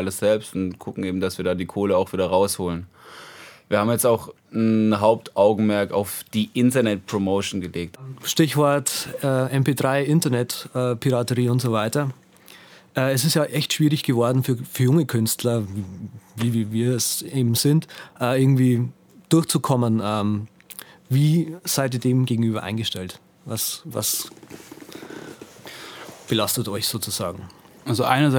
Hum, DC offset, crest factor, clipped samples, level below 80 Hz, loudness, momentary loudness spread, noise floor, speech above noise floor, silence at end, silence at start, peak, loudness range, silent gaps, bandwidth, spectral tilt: none; under 0.1%; 20 dB; under 0.1%; -60 dBFS; -22 LUFS; 18 LU; -48 dBFS; 27 dB; 0 s; 0 s; -2 dBFS; 6 LU; none; over 20 kHz; -5 dB/octave